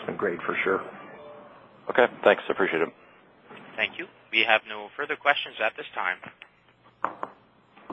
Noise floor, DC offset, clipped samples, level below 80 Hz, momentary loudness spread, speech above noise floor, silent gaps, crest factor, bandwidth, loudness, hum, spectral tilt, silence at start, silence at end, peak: -59 dBFS; under 0.1%; under 0.1%; -72 dBFS; 20 LU; 33 dB; none; 26 dB; 8 kHz; -26 LUFS; none; -6 dB/octave; 0 s; 0 s; -2 dBFS